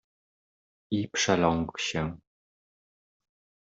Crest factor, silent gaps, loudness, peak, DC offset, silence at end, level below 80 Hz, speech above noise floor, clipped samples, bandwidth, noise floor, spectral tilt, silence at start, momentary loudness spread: 24 dB; none; -28 LUFS; -8 dBFS; under 0.1%; 1.5 s; -58 dBFS; over 62 dB; under 0.1%; 8 kHz; under -90 dBFS; -4 dB/octave; 0.9 s; 9 LU